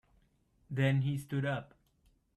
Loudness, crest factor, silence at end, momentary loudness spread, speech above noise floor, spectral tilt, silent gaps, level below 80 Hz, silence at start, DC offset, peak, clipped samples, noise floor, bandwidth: -34 LUFS; 18 dB; 0.7 s; 10 LU; 39 dB; -7.5 dB/octave; none; -68 dBFS; 0.7 s; under 0.1%; -18 dBFS; under 0.1%; -71 dBFS; 12 kHz